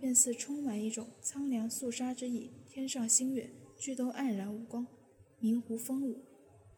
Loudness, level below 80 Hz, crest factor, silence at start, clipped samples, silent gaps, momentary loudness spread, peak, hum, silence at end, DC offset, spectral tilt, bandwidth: -35 LUFS; -82 dBFS; 24 dB; 0 s; under 0.1%; none; 14 LU; -12 dBFS; none; 0.05 s; under 0.1%; -3 dB/octave; 19 kHz